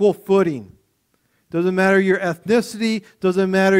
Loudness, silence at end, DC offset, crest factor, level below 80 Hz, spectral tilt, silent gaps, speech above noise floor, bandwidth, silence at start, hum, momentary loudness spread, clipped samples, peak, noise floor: -19 LUFS; 0 s; under 0.1%; 16 dB; -60 dBFS; -6 dB/octave; none; 48 dB; 15.5 kHz; 0 s; none; 7 LU; under 0.1%; -4 dBFS; -66 dBFS